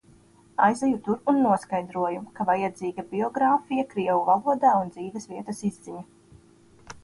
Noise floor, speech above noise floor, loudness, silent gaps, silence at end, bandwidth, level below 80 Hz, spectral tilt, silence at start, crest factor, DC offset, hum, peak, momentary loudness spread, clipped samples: -56 dBFS; 31 dB; -25 LUFS; none; 0.1 s; 11.5 kHz; -64 dBFS; -6.5 dB/octave; 0.6 s; 20 dB; under 0.1%; none; -6 dBFS; 14 LU; under 0.1%